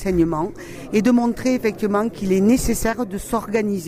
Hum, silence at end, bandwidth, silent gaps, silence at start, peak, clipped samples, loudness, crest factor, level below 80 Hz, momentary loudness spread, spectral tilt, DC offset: none; 0 s; 16 kHz; none; 0 s; -4 dBFS; under 0.1%; -20 LUFS; 16 dB; -38 dBFS; 9 LU; -6 dB/octave; under 0.1%